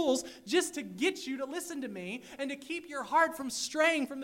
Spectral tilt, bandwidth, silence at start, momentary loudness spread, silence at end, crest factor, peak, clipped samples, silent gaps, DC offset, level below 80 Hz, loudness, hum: -2.5 dB/octave; 16 kHz; 0 s; 11 LU; 0 s; 18 dB; -14 dBFS; under 0.1%; none; under 0.1%; -74 dBFS; -33 LUFS; none